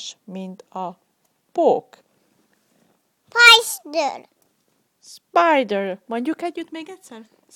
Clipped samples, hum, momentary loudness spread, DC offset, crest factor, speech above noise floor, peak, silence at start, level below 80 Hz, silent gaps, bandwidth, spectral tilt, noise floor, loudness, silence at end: under 0.1%; none; 24 LU; under 0.1%; 22 dB; 47 dB; 0 dBFS; 0 s; -74 dBFS; none; 19 kHz; -1.5 dB/octave; -67 dBFS; -17 LUFS; 0.35 s